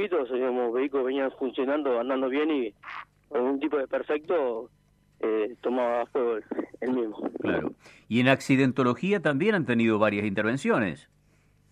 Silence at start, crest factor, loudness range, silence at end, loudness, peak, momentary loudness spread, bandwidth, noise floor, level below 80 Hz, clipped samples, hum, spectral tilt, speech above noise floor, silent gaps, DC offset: 0 s; 22 dB; 5 LU; 0.7 s; -27 LUFS; -4 dBFS; 10 LU; 10.5 kHz; -63 dBFS; -66 dBFS; under 0.1%; 50 Hz at -65 dBFS; -6.5 dB/octave; 36 dB; none; under 0.1%